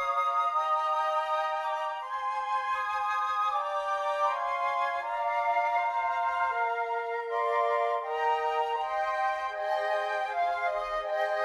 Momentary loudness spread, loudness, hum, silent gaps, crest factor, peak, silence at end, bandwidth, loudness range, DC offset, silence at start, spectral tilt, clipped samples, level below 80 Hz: 4 LU; -29 LUFS; none; none; 14 dB; -16 dBFS; 0 s; 13 kHz; 1 LU; under 0.1%; 0 s; -0.5 dB/octave; under 0.1%; -68 dBFS